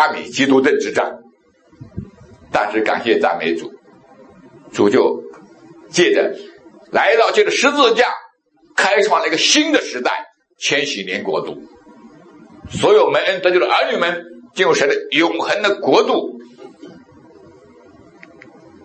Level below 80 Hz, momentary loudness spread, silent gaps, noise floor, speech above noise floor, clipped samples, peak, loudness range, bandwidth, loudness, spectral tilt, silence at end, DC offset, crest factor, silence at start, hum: -58 dBFS; 16 LU; none; -53 dBFS; 37 dB; under 0.1%; 0 dBFS; 6 LU; 8.8 kHz; -16 LUFS; -3 dB/octave; 1.85 s; under 0.1%; 18 dB; 0 s; none